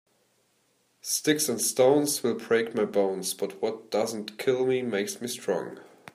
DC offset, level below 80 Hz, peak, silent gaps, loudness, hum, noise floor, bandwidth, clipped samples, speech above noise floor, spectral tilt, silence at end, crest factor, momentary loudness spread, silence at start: under 0.1%; -76 dBFS; -10 dBFS; none; -27 LUFS; none; -69 dBFS; 15.5 kHz; under 0.1%; 42 dB; -3.5 dB/octave; 0.25 s; 18 dB; 10 LU; 1.05 s